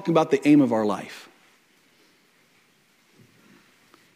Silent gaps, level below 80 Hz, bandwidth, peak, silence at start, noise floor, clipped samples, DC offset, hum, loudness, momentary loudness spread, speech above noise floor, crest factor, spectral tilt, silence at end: none; -74 dBFS; 11.5 kHz; -6 dBFS; 0 s; -62 dBFS; under 0.1%; under 0.1%; none; -21 LUFS; 22 LU; 41 dB; 20 dB; -7 dB/octave; 2.95 s